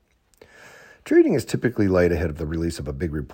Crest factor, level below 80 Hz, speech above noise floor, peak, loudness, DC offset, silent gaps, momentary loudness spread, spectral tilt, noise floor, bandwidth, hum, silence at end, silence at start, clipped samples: 16 dB; -40 dBFS; 34 dB; -6 dBFS; -22 LUFS; under 0.1%; none; 11 LU; -7 dB/octave; -55 dBFS; 16.5 kHz; none; 0 s; 0.65 s; under 0.1%